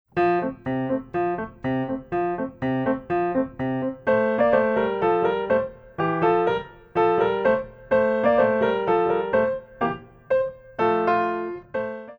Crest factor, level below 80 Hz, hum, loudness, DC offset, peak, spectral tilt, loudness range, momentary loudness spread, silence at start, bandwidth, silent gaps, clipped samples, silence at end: 16 dB; -54 dBFS; none; -23 LUFS; under 0.1%; -6 dBFS; -8.5 dB/octave; 4 LU; 8 LU; 0.15 s; 5.8 kHz; none; under 0.1%; 0.05 s